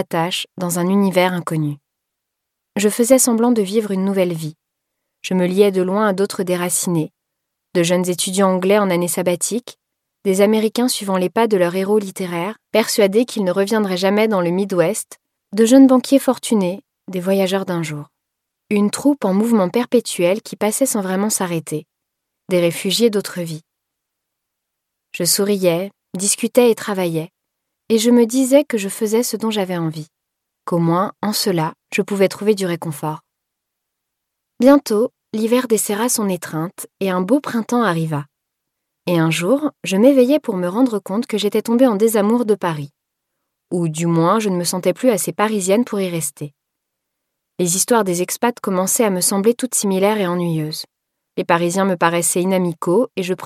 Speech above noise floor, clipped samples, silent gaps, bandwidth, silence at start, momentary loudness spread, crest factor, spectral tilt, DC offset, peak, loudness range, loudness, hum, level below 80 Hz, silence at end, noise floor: 62 dB; under 0.1%; none; 16 kHz; 0 s; 11 LU; 18 dB; -4.5 dB/octave; under 0.1%; 0 dBFS; 4 LU; -17 LUFS; none; -68 dBFS; 0 s; -79 dBFS